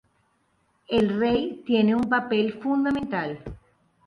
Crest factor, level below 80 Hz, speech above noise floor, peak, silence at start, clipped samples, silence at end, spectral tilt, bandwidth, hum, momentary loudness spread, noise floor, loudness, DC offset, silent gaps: 14 dB; -52 dBFS; 45 dB; -10 dBFS; 0.9 s; under 0.1%; 0.5 s; -7.5 dB/octave; 6.4 kHz; none; 9 LU; -68 dBFS; -24 LUFS; under 0.1%; none